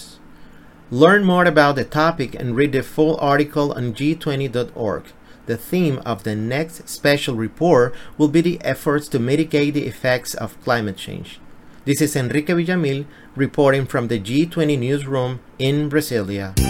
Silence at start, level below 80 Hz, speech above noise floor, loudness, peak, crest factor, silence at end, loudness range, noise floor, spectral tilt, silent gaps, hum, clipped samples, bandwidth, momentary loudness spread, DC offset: 0 s; -40 dBFS; 23 dB; -19 LUFS; 0 dBFS; 20 dB; 0 s; 5 LU; -42 dBFS; -6 dB/octave; none; none; under 0.1%; 17 kHz; 11 LU; under 0.1%